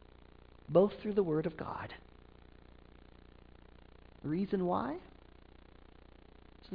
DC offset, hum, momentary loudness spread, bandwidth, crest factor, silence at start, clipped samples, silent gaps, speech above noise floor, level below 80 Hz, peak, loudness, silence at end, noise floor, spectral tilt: under 0.1%; 60 Hz at -60 dBFS; 17 LU; 5.2 kHz; 24 dB; 0.2 s; under 0.1%; none; 25 dB; -60 dBFS; -14 dBFS; -35 LUFS; 0 s; -58 dBFS; -7 dB/octave